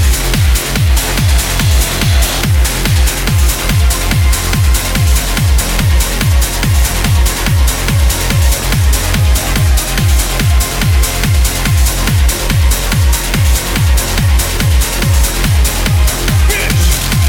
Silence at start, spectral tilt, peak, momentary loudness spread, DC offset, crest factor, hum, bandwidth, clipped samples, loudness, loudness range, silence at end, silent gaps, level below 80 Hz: 0 s; -4 dB/octave; 0 dBFS; 1 LU; under 0.1%; 10 dB; none; 17.5 kHz; under 0.1%; -12 LUFS; 0 LU; 0 s; none; -12 dBFS